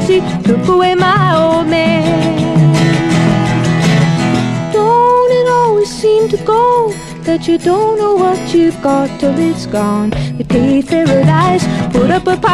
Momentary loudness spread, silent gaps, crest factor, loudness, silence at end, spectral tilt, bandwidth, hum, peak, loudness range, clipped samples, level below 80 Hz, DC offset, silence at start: 5 LU; none; 10 dB; -11 LUFS; 0 s; -6.5 dB/octave; 12.5 kHz; none; 0 dBFS; 2 LU; under 0.1%; -36 dBFS; under 0.1%; 0 s